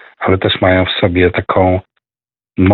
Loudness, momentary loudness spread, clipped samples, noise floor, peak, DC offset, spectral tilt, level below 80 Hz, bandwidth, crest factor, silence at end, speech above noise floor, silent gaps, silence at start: -13 LUFS; 5 LU; under 0.1%; under -90 dBFS; 0 dBFS; under 0.1%; -11 dB/octave; -38 dBFS; 4.5 kHz; 14 dB; 0 s; over 78 dB; none; 0.2 s